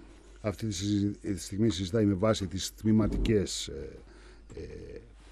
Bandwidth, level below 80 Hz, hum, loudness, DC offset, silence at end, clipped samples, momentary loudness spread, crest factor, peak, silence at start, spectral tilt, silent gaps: 13.5 kHz; -44 dBFS; none; -30 LUFS; under 0.1%; 0 s; under 0.1%; 19 LU; 16 dB; -14 dBFS; 0 s; -5.5 dB/octave; none